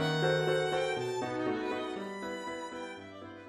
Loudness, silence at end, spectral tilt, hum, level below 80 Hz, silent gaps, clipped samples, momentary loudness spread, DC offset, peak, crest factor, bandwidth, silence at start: -34 LUFS; 0 s; -5 dB/octave; none; -68 dBFS; none; under 0.1%; 13 LU; under 0.1%; -18 dBFS; 16 dB; 13 kHz; 0 s